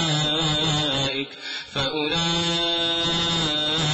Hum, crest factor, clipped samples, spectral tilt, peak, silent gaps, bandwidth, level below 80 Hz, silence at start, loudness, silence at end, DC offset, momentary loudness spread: none; 12 dB; under 0.1%; -3.5 dB/octave; -12 dBFS; none; 10.5 kHz; -46 dBFS; 0 s; -22 LUFS; 0 s; under 0.1%; 6 LU